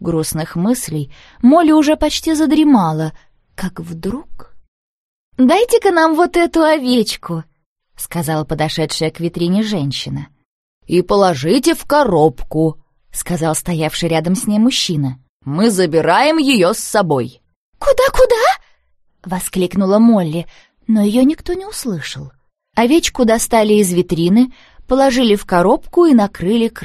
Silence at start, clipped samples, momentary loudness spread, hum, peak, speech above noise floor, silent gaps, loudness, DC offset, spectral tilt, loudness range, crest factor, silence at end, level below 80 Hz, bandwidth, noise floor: 0 s; under 0.1%; 14 LU; none; 0 dBFS; 43 dB; 4.68-5.32 s, 7.66-7.76 s, 10.45-10.81 s, 15.29-15.40 s, 17.56-17.73 s; -14 LUFS; under 0.1%; -5 dB/octave; 4 LU; 14 dB; 0 s; -38 dBFS; 13 kHz; -57 dBFS